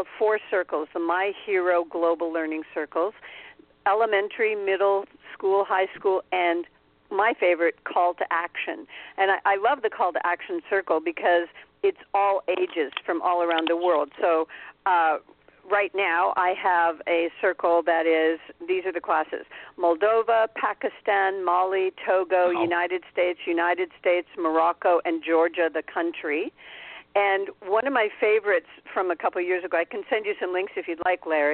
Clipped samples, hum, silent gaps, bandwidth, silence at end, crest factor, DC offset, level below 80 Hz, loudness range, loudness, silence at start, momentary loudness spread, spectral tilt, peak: under 0.1%; none; none; 4.4 kHz; 0 s; 16 dB; under 0.1%; -70 dBFS; 2 LU; -24 LUFS; 0 s; 8 LU; -7.5 dB/octave; -8 dBFS